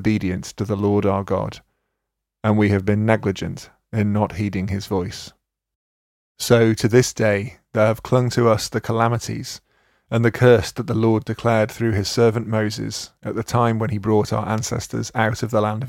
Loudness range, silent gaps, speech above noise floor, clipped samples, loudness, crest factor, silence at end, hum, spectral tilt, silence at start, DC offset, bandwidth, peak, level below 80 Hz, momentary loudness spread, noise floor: 3 LU; 5.75-6.35 s; 61 dB; under 0.1%; -20 LUFS; 20 dB; 0 s; none; -6 dB/octave; 0 s; under 0.1%; 16 kHz; 0 dBFS; -50 dBFS; 12 LU; -80 dBFS